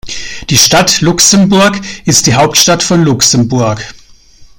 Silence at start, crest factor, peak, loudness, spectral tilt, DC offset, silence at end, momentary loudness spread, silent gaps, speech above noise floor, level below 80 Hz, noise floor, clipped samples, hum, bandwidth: 0.05 s; 10 dB; 0 dBFS; -7 LUFS; -3 dB/octave; under 0.1%; 0.15 s; 12 LU; none; 29 dB; -36 dBFS; -37 dBFS; 0.6%; none; over 20 kHz